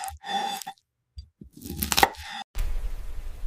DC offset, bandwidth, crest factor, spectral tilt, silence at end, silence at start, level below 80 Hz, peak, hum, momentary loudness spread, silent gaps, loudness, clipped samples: under 0.1%; 16 kHz; 26 dB; -2 dB/octave; 0 s; 0 s; -36 dBFS; -4 dBFS; none; 23 LU; 2.44-2.54 s; -28 LUFS; under 0.1%